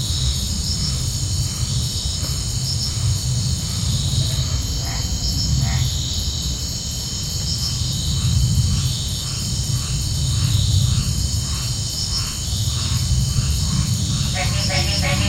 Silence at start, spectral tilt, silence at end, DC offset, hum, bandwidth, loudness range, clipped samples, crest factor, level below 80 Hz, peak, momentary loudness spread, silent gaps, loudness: 0 s; -3.5 dB/octave; 0 s; under 0.1%; none; 16.5 kHz; 1 LU; under 0.1%; 16 dB; -26 dBFS; -4 dBFS; 4 LU; none; -20 LUFS